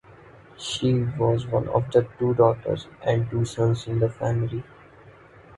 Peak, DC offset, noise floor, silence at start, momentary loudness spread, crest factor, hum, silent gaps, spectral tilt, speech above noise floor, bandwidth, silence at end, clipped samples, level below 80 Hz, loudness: -4 dBFS; under 0.1%; -49 dBFS; 0.6 s; 9 LU; 20 dB; none; none; -7 dB/octave; 26 dB; 11.5 kHz; 0.45 s; under 0.1%; -50 dBFS; -24 LUFS